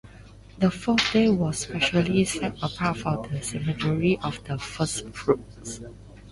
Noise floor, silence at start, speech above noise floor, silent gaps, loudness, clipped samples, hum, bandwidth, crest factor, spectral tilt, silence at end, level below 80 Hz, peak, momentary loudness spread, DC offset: -47 dBFS; 0.05 s; 22 dB; none; -25 LUFS; under 0.1%; none; 11.5 kHz; 18 dB; -5 dB/octave; 0 s; -48 dBFS; -8 dBFS; 11 LU; under 0.1%